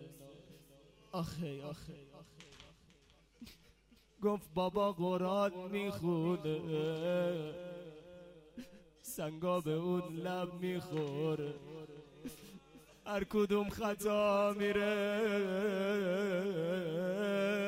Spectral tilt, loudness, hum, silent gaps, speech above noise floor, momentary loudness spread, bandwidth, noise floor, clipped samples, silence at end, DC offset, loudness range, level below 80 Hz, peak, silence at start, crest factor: -6 dB/octave; -36 LUFS; none; none; 31 dB; 22 LU; 16 kHz; -67 dBFS; under 0.1%; 0 s; under 0.1%; 11 LU; -66 dBFS; -22 dBFS; 0 s; 16 dB